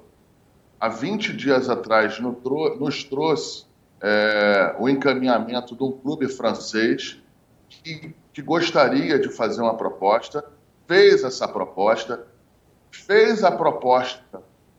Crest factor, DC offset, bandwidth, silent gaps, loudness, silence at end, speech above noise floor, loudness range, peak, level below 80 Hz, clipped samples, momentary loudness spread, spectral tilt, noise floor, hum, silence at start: 20 dB; under 0.1%; 8 kHz; none; -21 LUFS; 0.4 s; 37 dB; 4 LU; -2 dBFS; -66 dBFS; under 0.1%; 15 LU; -5 dB/octave; -58 dBFS; none; 0.8 s